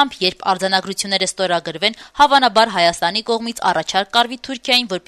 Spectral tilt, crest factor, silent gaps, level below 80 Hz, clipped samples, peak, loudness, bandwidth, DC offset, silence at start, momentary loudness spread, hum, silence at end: -2.5 dB/octave; 16 dB; none; -54 dBFS; under 0.1%; -2 dBFS; -17 LUFS; 13.5 kHz; under 0.1%; 0 s; 7 LU; none; 0.1 s